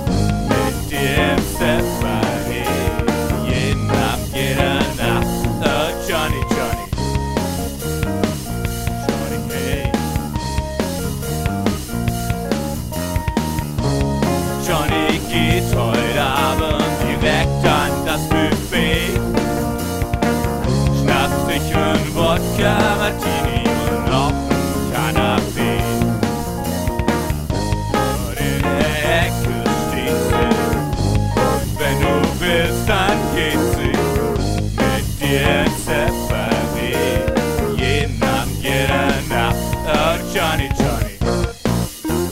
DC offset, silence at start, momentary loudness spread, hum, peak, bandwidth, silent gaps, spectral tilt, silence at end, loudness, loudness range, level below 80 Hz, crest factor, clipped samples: under 0.1%; 0 s; 5 LU; none; 0 dBFS; 16.5 kHz; none; -5 dB/octave; 0 s; -18 LUFS; 4 LU; -28 dBFS; 18 dB; under 0.1%